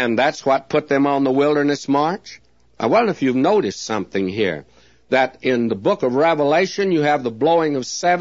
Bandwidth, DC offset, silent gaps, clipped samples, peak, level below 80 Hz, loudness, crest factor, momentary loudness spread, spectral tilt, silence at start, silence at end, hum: 7.8 kHz; 0.2%; none; under 0.1%; -4 dBFS; -60 dBFS; -18 LUFS; 14 dB; 6 LU; -5 dB/octave; 0 s; 0 s; none